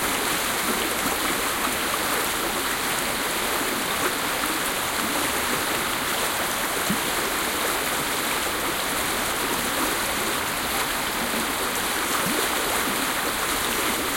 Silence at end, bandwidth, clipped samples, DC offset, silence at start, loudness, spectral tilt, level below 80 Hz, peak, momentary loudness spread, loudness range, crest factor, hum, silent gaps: 0 s; 17 kHz; under 0.1%; under 0.1%; 0 s; -23 LUFS; -1.5 dB/octave; -48 dBFS; -8 dBFS; 1 LU; 0 LU; 18 dB; none; none